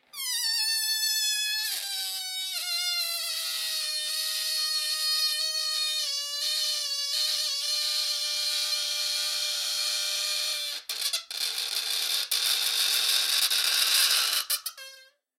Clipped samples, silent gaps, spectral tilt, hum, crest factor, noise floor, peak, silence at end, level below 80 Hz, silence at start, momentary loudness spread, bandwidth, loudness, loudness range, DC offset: under 0.1%; none; 6 dB/octave; none; 22 dB; -53 dBFS; -8 dBFS; 0.35 s; -84 dBFS; 0.15 s; 7 LU; 16.5 kHz; -25 LUFS; 4 LU; under 0.1%